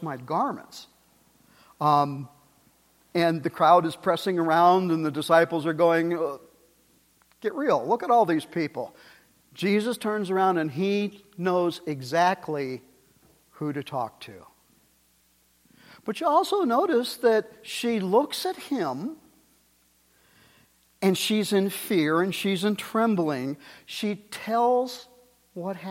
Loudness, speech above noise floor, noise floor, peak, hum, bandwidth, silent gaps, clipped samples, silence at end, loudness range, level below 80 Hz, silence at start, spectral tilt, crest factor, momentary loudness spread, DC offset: -25 LUFS; 39 dB; -64 dBFS; -6 dBFS; none; 16.5 kHz; none; under 0.1%; 0 s; 8 LU; -74 dBFS; 0 s; -5.5 dB/octave; 20 dB; 14 LU; under 0.1%